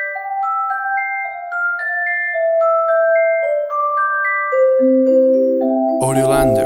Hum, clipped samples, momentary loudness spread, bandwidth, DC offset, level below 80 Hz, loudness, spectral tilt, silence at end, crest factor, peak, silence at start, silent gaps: none; under 0.1%; 7 LU; 16 kHz; under 0.1%; -44 dBFS; -16 LUFS; -6 dB/octave; 0 s; 14 dB; -2 dBFS; 0 s; none